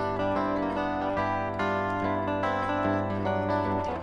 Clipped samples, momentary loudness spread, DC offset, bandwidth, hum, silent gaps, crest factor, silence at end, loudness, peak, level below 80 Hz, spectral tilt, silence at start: under 0.1%; 1 LU; under 0.1%; 10 kHz; none; none; 14 dB; 0 s; -28 LUFS; -14 dBFS; -52 dBFS; -7.5 dB/octave; 0 s